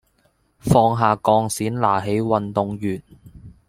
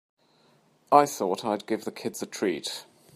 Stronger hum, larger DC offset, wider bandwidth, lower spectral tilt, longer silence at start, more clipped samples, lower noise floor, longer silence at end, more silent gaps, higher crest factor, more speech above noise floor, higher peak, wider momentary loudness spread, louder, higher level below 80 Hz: neither; neither; about the same, 16.5 kHz vs 15.5 kHz; first, -6.5 dB/octave vs -4 dB/octave; second, 0.65 s vs 0.9 s; neither; about the same, -63 dBFS vs -63 dBFS; second, 0.2 s vs 0.35 s; neither; second, 20 dB vs 26 dB; first, 43 dB vs 37 dB; about the same, -2 dBFS vs -4 dBFS; about the same, 11 LU vs 13 LU; first, -20 LUFS vs -27 LUFS; first, -48 dBFS vs -78 dBFS